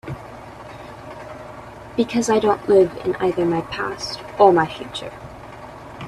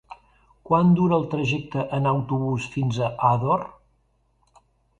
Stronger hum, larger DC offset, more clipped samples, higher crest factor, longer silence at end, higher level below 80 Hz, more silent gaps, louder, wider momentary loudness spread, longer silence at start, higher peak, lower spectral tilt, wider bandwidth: neither; neither; neither; about the same, 20 dB vs 18 dB; second, 0 s vs 1.3 s; about the same, -50 dBFS vs -54 dBFS; neither; first, -19 LUFS vs -23 LUFS; first, 22 LU vs 8 LU; about the same, 0.05 s vs 0.1 s; first, 0 dBFS vs -6 dBFS; second, -5.5 dB/octave vs -8 dB/octave; first, 13 kHz vs 8 kHz